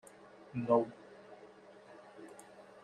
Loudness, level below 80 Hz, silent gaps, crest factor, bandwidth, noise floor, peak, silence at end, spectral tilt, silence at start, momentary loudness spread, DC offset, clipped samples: -34 LUFS; -78 dBFS; none; 22 dB; 12 kHz; -57 dBFS; -16 dBFS; 0.2 s; -7.5 dB/octave; 0.55 s; 25 LU; under 0.1%; under 0.1%